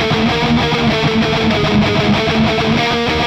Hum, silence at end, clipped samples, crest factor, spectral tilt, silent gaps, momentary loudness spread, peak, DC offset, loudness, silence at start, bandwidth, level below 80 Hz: none; 0 s; under 0.1%; 10 dB; -5.5 dB/octave; none; 1 LU; -4 dBFS; under 0.1%; -14 LUFS; 0 s; 15 kHz; -32 dBFS